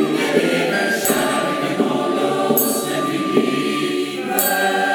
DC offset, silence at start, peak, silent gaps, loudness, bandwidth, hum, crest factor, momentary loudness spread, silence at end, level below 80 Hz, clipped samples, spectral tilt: under 0.1%; 0 s; -2 dBFS; none; -18 LUFS; 19.5 kHz; none; 18 dB; 4 LU; 0 s; -62 dBFS; under 0.1%; -3.5 dB/octave